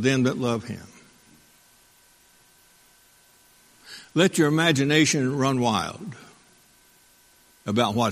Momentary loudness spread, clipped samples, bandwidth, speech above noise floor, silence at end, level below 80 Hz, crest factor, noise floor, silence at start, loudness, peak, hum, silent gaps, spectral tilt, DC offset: 20 LU; under 0.1%; 15.5 kHz; 35 dB; 0 s; -62 dBFS; 22 dB; -58 dBFS; 0 s; -22 LUFS; -4 dBFS; none; none; -4.5 dB/octave; under 0.1%